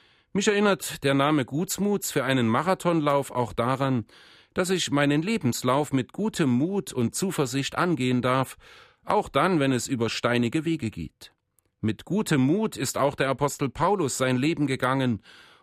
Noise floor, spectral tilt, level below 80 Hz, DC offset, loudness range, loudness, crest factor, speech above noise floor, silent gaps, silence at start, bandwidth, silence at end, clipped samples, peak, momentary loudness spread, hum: -66 dBFS; -5 dB/octave; -58 dBFS; under 0.1%; 2 LU; -25 LUFS; 16 dB; 41 dB; none; 0.35 s; 15.5 kHz; 0.45 s; under 0.1%; -8 dBFS; 7 LU; none